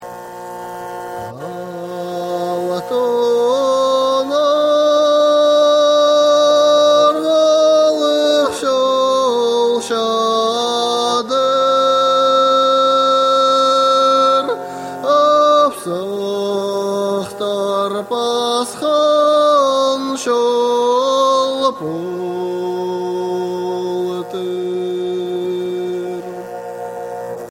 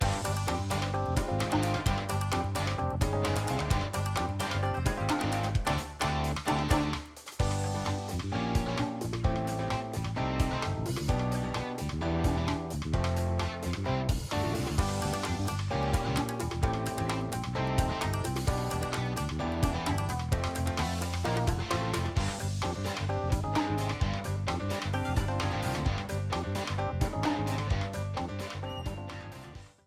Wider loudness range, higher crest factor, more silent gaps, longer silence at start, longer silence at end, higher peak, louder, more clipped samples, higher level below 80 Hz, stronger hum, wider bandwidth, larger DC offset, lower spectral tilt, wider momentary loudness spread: first, 9 LU vs 2 LU; second, 12 dB vs 20 dB; neither; about the same, 0 s vs 0 s; second, 0 s vs 0.2 s; first, -2 dBFS vs -10 dBFS; first, -15 LUFS vs -32 LUFS; neither; second, -64 dBFS vs -40 dBFS; neither; about the same, 16 kHz vs 16 kHz; neither; second, -3.5 dB/octave vs -5.5 dB/octave; first, 15 LU vs 4 LU